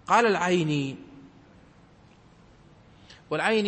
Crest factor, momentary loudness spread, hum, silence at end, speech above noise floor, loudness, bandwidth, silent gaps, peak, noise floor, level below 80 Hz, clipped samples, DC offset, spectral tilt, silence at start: 20 dB; 20 LU; none; 0 s; 31 dB; -25 LUFS; 8.8 kHz; none; -8 dBFS; -55 dBFS; -64 dBFS; under 0.1%; under 0.1%; -5 dB/octave; 0.1 s